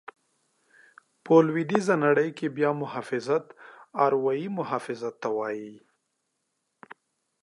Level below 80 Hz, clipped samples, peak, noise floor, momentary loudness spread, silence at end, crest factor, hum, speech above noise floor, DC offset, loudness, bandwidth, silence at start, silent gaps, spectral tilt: -82 dBFS; under 0.1%; -4 dBFS; -78 dBFS; 12 LU; 0.5 s; 24 dB; none; 53 dB; under 0.1%; -26 LUFS; 11.5 kHz; 1.25 s; none; -7 dB/octave